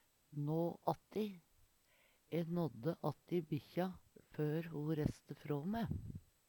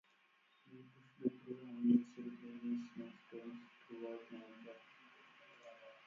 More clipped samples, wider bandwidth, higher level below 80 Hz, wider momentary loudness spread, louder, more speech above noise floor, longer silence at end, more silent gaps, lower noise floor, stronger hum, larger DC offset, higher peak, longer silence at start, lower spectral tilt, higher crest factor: neither; first, 19 kHz vs 6.8 kHz; first, -64 dBFS vs under -90 dBFS; second, 11 LU vs 27 LU; about the same, -42 LUFS vs -43 LUFS; about the same, 32 dB vs 31 dB; first, 0.3 s vs 0 s; neither; about the same, -73 dBFS vs -74 dBFS; neither; neither; about the same, -22 dBFS vs -22 dBFS; second, 0.3 s vs 0.65 s; first, -8.5 dB/octave vs -6.5 dB/octave; about the same, 22 dB vs 24 dB